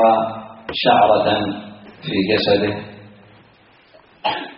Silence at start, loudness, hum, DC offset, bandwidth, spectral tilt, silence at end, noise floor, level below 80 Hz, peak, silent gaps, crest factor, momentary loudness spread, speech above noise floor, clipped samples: 0 s; -18 LUFS; none; under 0.1%; 5.6 kHz; -3 dB/octave; 0.05 s; -51 dBFS; -54 dBFS; -2 dBFS; none; 18 dB; 18 LU; 34 dB; under 0.1%